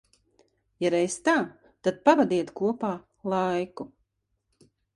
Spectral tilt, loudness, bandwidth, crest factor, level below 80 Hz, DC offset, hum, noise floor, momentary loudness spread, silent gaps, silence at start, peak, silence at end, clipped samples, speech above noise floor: -5 dB/octave; -26 LUFS; 11.5 kHz; 22 dB; -68 dBFS; under 0.1%; none; -77 dBFS; 15 LU; none; 0.8 s; -6 dBFS; 1.1 s; under 0.1%; 52 dB